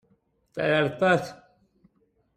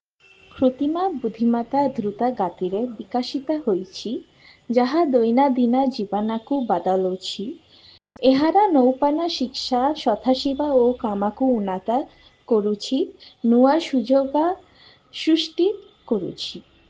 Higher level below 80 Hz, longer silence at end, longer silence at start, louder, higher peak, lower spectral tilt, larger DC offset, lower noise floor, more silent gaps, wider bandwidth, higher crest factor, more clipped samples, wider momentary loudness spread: second, -64 dBFS vs -58 dBFS; first, 1 s vs 0.3 s; about the same, 0.55 s vs 0.55 s; second, -24 LUFS vs -21 LUFS; second, -8 dBFS vs -4 dBFS; about the same, -6 dB/octave vs -6 dB/octave; neither; first, -68 dBFS vs -54 dBFS; neither; first, 14.5 kHz vs 8 kHz; about the same, 20 dB vs 16 dB; neither; first, 18 LU vs 11 LU